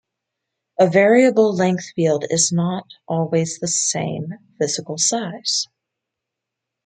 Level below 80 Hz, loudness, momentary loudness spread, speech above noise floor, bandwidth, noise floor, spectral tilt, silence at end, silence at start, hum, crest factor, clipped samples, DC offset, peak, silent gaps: -66 dBFS; -18 LUFS; 13 LU; 64 dB; 9.6 kHz; -82 dBFS; -4 dB/octave; 1.2 s; 0.8 s; none; 18 dB; under 0.1%; under 0.1%; -2 dBFS; none